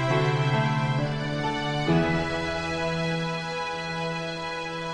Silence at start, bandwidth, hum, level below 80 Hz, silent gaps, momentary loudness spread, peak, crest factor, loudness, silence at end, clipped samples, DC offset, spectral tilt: 0 s; 10.5 kHz; none; -48 dBFS; none; 7 LU; -12 dBFS; 16 dB; -27 LUFS; 0 s; under 0.1%; under 0.1%; -6 dB/octave